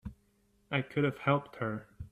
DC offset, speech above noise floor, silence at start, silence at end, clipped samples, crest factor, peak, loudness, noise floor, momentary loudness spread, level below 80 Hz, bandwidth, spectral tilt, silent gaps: under 0.1%; 38 dB; 0.05 s; 0.05 s; under 0.1%; 20 dB; -14 dBFS; -33 LUFS; -70 dBFS; 11 LU; -58 dBFS; 8.2 kHz; -8 dB/octave; none